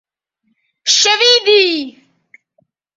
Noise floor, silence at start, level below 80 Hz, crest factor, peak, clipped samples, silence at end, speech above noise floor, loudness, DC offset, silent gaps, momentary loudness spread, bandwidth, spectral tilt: -67 dBFS; 0.85 s; -68 dBFS; 16 dB; 0 dBFS; under 0.1%; 1.05 s; 55 dB; -11 LUFS; under 0.1%; none; 13 LU; 8 kHz; 1 dB/octave